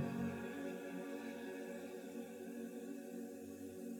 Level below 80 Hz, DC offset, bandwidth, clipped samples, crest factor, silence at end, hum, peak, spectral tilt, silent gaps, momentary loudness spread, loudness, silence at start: -84 dBFS; under 0.1%; 19 kHz; under 0.1%; 18 dB; 0 s; none; -28 dBFS; -6 dB/octave; none; 6 LU; -48 LUFS; 0 s